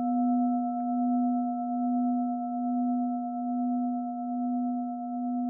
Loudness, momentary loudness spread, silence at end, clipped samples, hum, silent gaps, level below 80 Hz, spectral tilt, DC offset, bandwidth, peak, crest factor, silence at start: -29 LUFS; 5 LU; 0 s; under 0.1%; none; none; under -90 dBFS; -13.5 dB/octave; under 0.1%; 1.4 kHz; -20 dBFS; 10 dB; 0 s